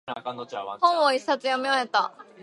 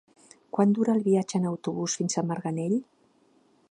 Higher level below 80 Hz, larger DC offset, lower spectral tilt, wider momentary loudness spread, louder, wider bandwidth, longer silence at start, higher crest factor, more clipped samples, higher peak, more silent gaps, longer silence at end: second, -82 dBFS vs -76 dBFS; neither; second, -2.5 dB/octave vs -6 dB/octave; first, 13 LU vs 7 LU; about the same, -25 LUFS vs -27 LUFS; about the same, 11.5 kHz vs 10.5 kHz; second, 0.05 s vs 0.55 s; about the same, 18 dB vs 18 dB; neither; about the same, -8 dBFS vs -10 dBFS; neither; second, 0 s vs 0.85 s